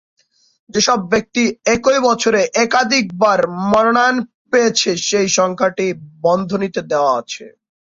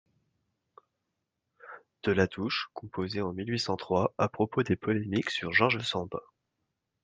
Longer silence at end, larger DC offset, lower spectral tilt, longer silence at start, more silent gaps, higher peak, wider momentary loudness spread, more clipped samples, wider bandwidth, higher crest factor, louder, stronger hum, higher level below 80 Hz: second, 0.35 s vs 0.85 s; neither; second, -3 dB/octave vs -5.5 dB/octave; second, 0.7 s vs 1.65 s; first, 4.34-4.45 s vs none; first, -2 dBFS vs -8 dBFS; second, 7 LU vs 13 LU; neither; second, 7.8 kHz vs 9.6 kHz; second, 14 dB vs 24 dB; first, -15 LUFS vs -30 LUFS; neither; first, -54 dBFS vs -66 dBFS